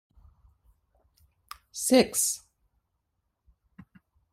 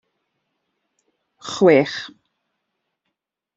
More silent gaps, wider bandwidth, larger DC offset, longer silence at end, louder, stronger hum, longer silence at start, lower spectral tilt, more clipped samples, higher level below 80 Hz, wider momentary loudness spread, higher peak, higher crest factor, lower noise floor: neither; first, 16 kHz vs 8 kHz; neither; first, 1.95 s vs 1.5 s; second, -25 LUFS vs -16 LUFS; neither; first, 1.75 s vs 1.45 s; second, -2.5 dB/octave vs -5.5 dB/octave; neither; about the same, -64 dBFS vs -68 dBFS; first, 26 LU vs 23 LU; second, -8 dBFS vs -2 dBFS; about the same, 24 dB vs 22 dB; about the same, -79 dBFS vs -80 dBFS